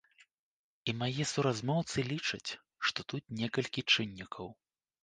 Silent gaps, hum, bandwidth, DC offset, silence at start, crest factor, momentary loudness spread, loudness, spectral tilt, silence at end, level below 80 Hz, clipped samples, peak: none; none; 9.8 kHz; under 0.1%; 0.85 s; 22 dB; 13 LU; -34 LUFS; -4 dB/octave; 0.5 s; -68 dBFS; under 0.1%; -14 dBFS